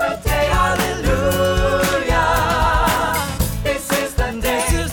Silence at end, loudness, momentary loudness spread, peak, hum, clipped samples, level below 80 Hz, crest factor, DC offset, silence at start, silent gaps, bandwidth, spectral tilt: 0 s; -18 LUFS; 4 LU; -6 dBFS; none; under 0.1%; -24 dBFS; 12 dB; under 0.1%; 0 s; none; over 20 kHz; -4 dB/octave